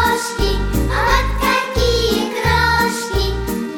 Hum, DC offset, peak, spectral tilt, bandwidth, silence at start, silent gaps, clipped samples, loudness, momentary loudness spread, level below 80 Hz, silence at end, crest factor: none; 0.2%; -2 dBFS; -4.5 dB/octave; 20 kHz; 0 s; none; under 0.1%; -17 LUFS; 5 LU; -22 dBFS; 0 s; 14 dB